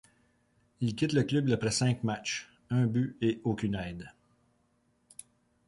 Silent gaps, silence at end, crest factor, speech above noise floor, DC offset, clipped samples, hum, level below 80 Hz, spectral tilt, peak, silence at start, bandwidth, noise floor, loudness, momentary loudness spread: none; 1.6 s; 18 dB; 42 dB; under 0.1%; under 0.1%; none; -60 dBFS; -5.5 dB/octave; -14 dBFS; 0.8 s; 11.5 kHz; -72 dBFS; -31 LUFS; 22 LU